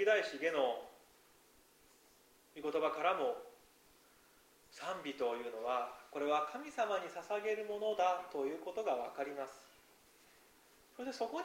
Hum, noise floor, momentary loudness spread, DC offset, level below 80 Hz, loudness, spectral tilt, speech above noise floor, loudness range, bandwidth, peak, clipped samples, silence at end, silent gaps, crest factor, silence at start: none; -67 dBFS; 13 LU; under 0.1%; -82 dBFS; -39 LUFS; -3 dB/octave; 29 dB; 4 LU; 16 kHz; -20 dBFS; under 0.1%; 0 s; none; 20 dB; 0 s